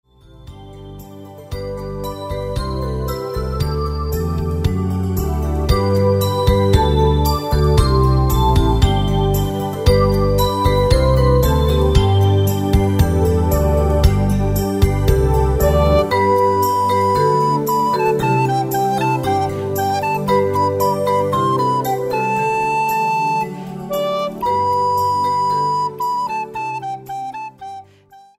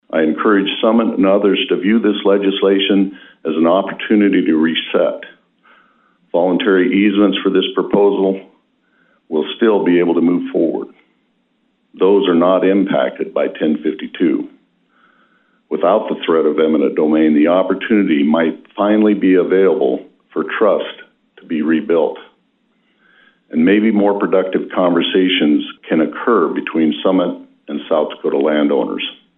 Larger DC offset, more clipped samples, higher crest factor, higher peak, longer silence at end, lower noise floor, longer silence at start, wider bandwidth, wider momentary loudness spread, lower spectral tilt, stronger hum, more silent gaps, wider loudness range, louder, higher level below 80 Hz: neither; neither; about the same, 16 dB vs 14 dB; about the same, 0 dBFS vs -2 dBFS; about the same, 0.2 s vs 0.25 s; second, -46 dBFS vs -62 dBFS; first, 0.45 s vs 0.15 s; first, 16 kHz vs 4 kHz; about the same, 11 LU vs 9 LU; second, -6.5 dB/octave vs -10 dB/octave; neither; neither; about the same, 6 LU vs 4 LU; about the same, -17 LUFS vs -15 LUFS; first, -24 dBFS vs -64 dBFS